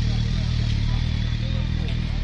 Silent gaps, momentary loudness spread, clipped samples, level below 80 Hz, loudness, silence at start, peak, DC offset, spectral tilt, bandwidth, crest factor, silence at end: none; 2 LU; under 0.1%; -26 dBFS; -25 LUFS; 0 s; -12 dBFS; under 0.1%; -6.5 dB/octave; 7.8 kHz; 12 dB; 0 s